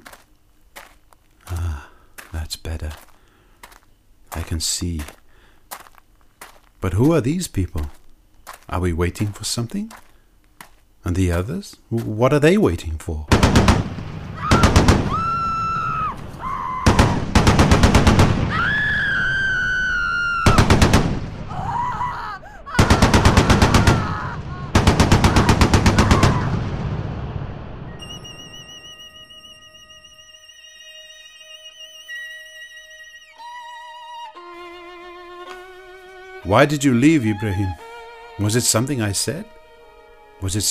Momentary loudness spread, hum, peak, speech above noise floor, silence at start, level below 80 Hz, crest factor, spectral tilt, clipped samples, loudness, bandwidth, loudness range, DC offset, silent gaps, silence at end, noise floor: 23 LU; none; 0 dBFS; 34 dB; 0.1 s; -28 dBFS; 20 dB; -5 dB/octave; under 0.1%; -18 LUFS; 15.5 kHz; 20 LU; under 0.1%; none; 0 s; -53 dBFS